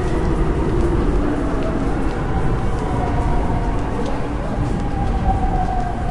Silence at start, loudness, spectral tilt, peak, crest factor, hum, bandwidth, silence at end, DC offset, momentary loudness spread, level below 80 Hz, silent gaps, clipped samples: 0 s; -21 LUFS; -8 dB/octave; -4 dBFS; 14 dB; none; 11 kHz; 0 s; under 0.1%; 3 LU; -22 dBFS; none; under 0.1%